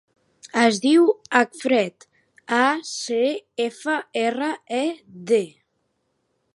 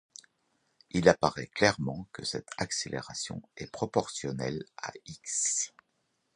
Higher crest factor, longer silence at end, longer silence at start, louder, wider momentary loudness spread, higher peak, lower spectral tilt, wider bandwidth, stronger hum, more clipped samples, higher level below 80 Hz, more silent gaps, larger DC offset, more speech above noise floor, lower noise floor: second, 22 dB vs 28 dB; first, 1.05 s vs 0.7 s; second, 0.45 s vs 0.95 s; first, -22 LUFS vs -31 LUFS; second, 10 LU vs 16 LU; about the same, -2 dBFS vs -4 dBFS; about the same, -3.5 dB/octave vs -3.5 dB/octave; about the same, 11.5 kHz vs 11.5 kHz; neither; neither; second, -78 dBFS vs -60 dBFS; neither; neither; first, 51 dB vs 46 dB; second, -72 dBFS vs -77 dBFS